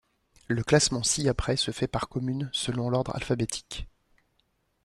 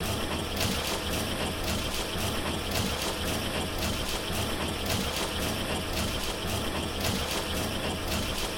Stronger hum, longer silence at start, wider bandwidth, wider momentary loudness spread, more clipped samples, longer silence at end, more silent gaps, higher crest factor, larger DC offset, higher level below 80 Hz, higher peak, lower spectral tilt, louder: neither; first, 0.5 s vs 0 s; second, 13 kHz vs 17 kHz; first, 11 LU vs 2 LU; neither; first, 0.95 s vs 0 s; neither; about the same, 20 dB vs 16 dB; neither; second, -46 dBFS vs -40 dBFS; first, -8 dBFS vs -16 dBFS; about the same, -4 dB/octave vs -3.5 dB/octave; first, -27 LUFS vs -30 LUFS